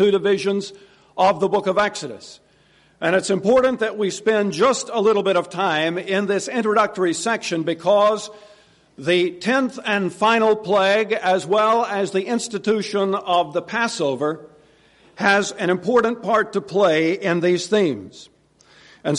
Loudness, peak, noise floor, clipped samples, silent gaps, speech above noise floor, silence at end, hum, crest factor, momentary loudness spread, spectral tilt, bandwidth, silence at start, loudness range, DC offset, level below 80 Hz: -20 LUFS; -4 dBFS; -56 dBFS; under 0.1%; none; 37 dB; 0 s; none; 16 dB; 7 LU; -4.5 dB/octave; 11.5 kHz; 0 s; 3 LU; under 0.1%; -62 dBFS